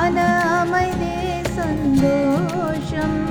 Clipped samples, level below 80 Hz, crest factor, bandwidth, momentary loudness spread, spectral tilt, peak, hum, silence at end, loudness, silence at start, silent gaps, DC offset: under 0.1%; -36 dBFS; 14 dB; 18.5 kHz; 6 LU; -6.5 dB/octave; -4 dBFS; none; 0 s; -20 LUFS; 0 s; none; under 0.1%